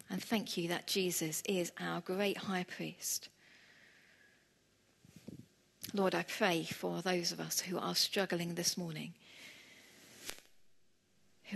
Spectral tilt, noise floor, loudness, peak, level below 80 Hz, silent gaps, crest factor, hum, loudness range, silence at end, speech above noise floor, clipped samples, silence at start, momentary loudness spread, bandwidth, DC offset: -3 dB/octave; -72 dBFS; -36 LUFS; -16 dBFS; -80 dBFS; none; 24 dB; none; 8 LU; 0 s; 35 dB; under 0.1%; 0.1 s; 21 LU; 13 kHz; under 0.1%